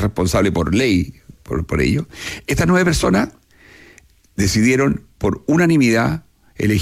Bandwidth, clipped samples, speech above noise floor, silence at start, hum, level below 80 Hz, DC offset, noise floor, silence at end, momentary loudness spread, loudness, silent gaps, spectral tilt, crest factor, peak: 15.5 kHz; under 0.1%; 33 dB; 0 s; none; -34 dBFS; under 0.1%; -49 dBFS; 0 s; 12 LU; -17 LUFS; none; -5.5 dB/octave; 12 dB; -6 dBFS